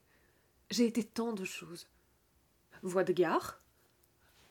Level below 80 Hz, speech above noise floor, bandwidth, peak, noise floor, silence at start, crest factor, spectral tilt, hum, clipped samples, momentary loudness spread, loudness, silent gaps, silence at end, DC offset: -74 dBFS; 38 dB; 18.5 kHz; -18 dBFS; -71 dBFS; 0.7 s; 20 dB; -4.5 dB/octave; none; under 0.1%; 16 LU; -34 LUFS; none; 0.95 s; under 0.1%